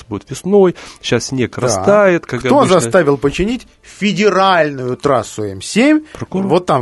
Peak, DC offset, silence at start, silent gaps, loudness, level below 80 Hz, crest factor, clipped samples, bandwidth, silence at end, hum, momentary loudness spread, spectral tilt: 0 dBFS; under 0.1%; 0.1 s; none; -14 LUFS; -42 dBFS; 14 dB; under 0.1%; 12 kHz; 0 s; none; 12 LU; -5 dB/octave